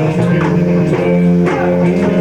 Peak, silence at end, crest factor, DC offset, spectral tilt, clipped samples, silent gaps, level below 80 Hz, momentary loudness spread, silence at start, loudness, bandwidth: -2 dBFS; 0 s; 10 dB; under 0.1%; -8.5 dB/octave; under 0.1%; none; -40 dBFS; 2 LU; 0 s; -12 LUFS; 8.6 kHz